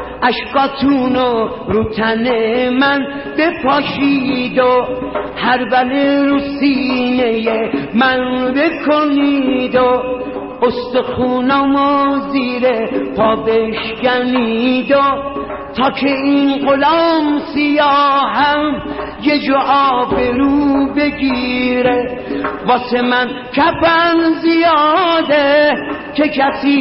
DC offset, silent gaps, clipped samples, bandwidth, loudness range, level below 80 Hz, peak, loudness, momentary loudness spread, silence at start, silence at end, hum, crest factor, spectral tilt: under 0.1%; none; under 0.1%; 5.8 kHz; 2 LU; -42 dBFS; -2 dBFS; -14 LUFS; 6 LU; 0 s; 0 s; none; 12 dB; -2.5 dB/octave